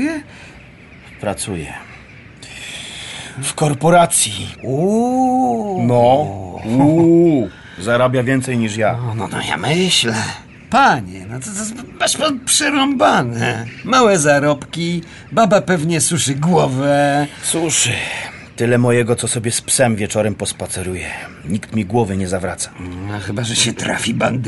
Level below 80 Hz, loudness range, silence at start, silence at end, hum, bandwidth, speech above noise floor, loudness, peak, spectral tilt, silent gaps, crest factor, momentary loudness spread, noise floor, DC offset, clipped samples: -48 dBFS; 5 LU; 0 s; 0 s; none; 12 kHz; 24 dB; -16 LUFS; -2 dBFS; -4 dB/octave; none; 16 dB; 14 LU; -40 dBFS; under 0.1%; under 0.1%